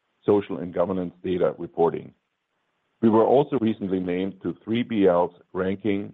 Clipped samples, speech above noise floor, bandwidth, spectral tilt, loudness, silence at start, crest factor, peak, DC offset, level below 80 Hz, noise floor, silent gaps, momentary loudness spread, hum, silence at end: under 0.1%; 52 dB; 4.1 kHz; -10 dB/octave; -24 LUFS; 0.25 s; 18 dB; -6 dBFS; under 0.1%; -64 dBFS; -75 dBFS; none; 9 LU; none; 0 s